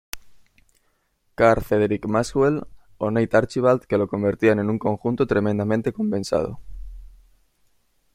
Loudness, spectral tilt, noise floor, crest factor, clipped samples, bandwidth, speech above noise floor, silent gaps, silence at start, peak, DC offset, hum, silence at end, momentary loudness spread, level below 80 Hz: -22 LUFS; -7 dB/octave; -68 dBFS; 20 dB; under 0.1%; 16.5 kHz; 47 dB; none; 0.15 s; -2 dBFS; under 0.1%; none; 1.05 s; 14 LU; -46 dBFS